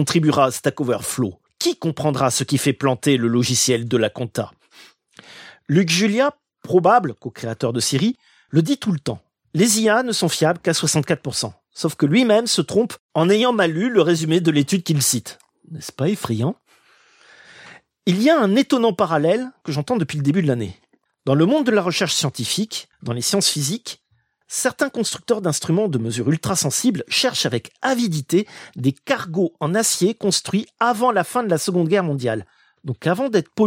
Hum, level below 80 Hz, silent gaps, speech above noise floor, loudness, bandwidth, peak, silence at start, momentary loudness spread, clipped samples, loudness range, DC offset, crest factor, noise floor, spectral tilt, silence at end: none; -62 dBFS; 13.00-13.09 s; 45 dB; -19 LUFS; 16.5 kHz; -2 dBFS; 0 s; 10 LU; under 0.1%; 3 LU; under 0.1%; 18 dB; -64 dBFS; -4.5 dB/octave; 0 s